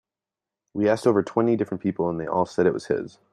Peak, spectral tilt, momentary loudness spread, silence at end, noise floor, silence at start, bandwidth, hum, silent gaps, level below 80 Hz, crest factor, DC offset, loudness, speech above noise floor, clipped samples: -6 dBFS; -7.5 dB/octave; 7 LU; 0.25 s; -89 dBFS; 0.75 s; 11.5 kHz; none; none; -62 dBFS; 18 dB; under 0.1%; -24 LUFS; 66 dB; under 0.1%